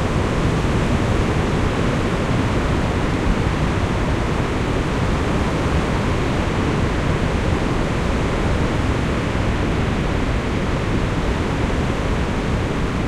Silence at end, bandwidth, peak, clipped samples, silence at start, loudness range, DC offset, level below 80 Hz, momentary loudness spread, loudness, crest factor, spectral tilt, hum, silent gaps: 0 s; 13 kHz; -6 dBFS; under 0.1%; 0 s; 1 LU; under 0.1%; -26 dBFS; 2 LU; -20 LUFS; 14 dB; -6.5 dB/octave; none; none